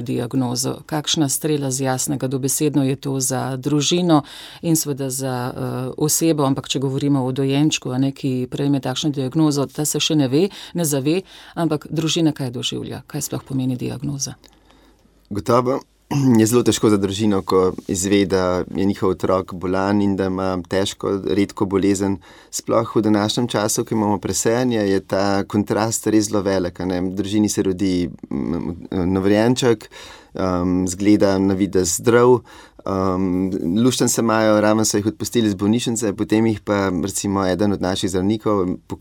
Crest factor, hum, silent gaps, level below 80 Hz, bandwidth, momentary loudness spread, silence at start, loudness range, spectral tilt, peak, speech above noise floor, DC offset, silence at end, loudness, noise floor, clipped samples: 18 dB; none; none; -50 dBFS; 17.5 kHz; 8 LU; 0 s; 3 LU; -5 dB/octave; -2 dBFS; 34 dB; under 0.1%; 0.05 s; -19 LUFS; -53 dBFS; under 0.1%